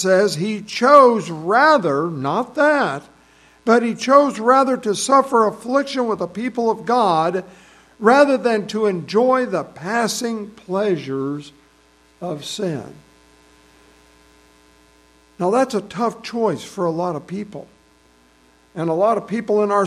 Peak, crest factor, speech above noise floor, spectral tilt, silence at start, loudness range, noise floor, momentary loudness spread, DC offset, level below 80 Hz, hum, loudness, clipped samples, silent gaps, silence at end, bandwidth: 0 dBFS; 18 dB; 36 dB; -5 dB/octave; 0 s; 12 LU; -54 dBFS; 13 LU; under 0.1%; -62 dBFS; none; -18 LUFS; under 0.1%; none; 0 s; 13.5 kHz